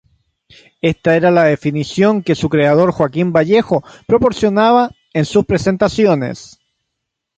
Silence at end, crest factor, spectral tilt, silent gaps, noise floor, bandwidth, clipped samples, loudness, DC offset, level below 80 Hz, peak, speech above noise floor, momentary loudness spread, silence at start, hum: 0.95 s; 14 dB; -6.5 dB/octave; none; -76 dBFS; 9.2 kHz; under 0.1%; -14 LUFS; under 0.1%; -44 dBFS; -2 dBFS; 63 dB; 8 LU; 0.85 s; none